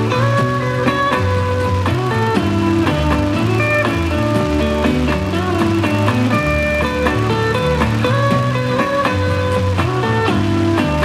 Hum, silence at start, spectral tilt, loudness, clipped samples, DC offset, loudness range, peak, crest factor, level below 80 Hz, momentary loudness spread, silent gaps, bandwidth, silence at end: none; 0 s; -6.5 dB/octave; -16 LUFS; under 0.1%; under 0.1%; 0 LU; -2 dBFS; 14 dB; -30 dBFS; 2 LU; none; 14.5 kHz; 0 s